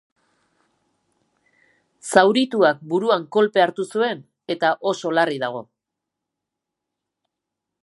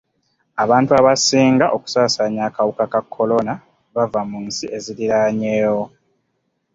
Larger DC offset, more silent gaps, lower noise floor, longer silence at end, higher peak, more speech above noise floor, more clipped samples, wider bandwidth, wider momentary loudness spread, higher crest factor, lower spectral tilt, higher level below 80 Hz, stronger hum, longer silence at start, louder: neither; neither; first, -83 dBFS vs -70 dBFS; first, 2.2 s vs 0.85 s; about the same, 0 dBFS vs -2 dBFS; first, 64 dB vs 53 dB; neither; first, 11.5 kHz vs 7.8 kHz; about the same, 12 LU vs 13 LU; first, 22 dB vs 16 dB; about the same, -4.5 dB/octave vs -4.5 dB/octave; second, -72 dBFS vs -58 dBFS; neither; first, 2.05 s vs 0.55 s; second, -20 LUFS vs -17 LUFS